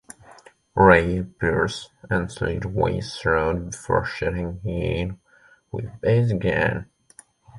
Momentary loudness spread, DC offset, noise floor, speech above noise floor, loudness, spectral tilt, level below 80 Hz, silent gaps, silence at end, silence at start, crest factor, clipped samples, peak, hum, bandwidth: 14 LU; under 0.1%; -56 dBFS; 34 dB; -23 LUFS; -6.5 dB/octave; -40 dBFS; none; 0 s; 0.3 s; 22 dB; under 0.1%; -2 dBFS; none; 11.5 kHz